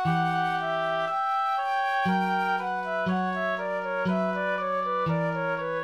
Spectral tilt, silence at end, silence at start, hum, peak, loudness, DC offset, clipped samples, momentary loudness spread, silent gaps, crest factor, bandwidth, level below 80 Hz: -7 dB/octave; 0 s; 0 s; none; -14 dBFS; -27 LUFS; under 0.1%; under 0.1%; 3 LU; none; 12 dB; 12.5 kHz; -66 dBFS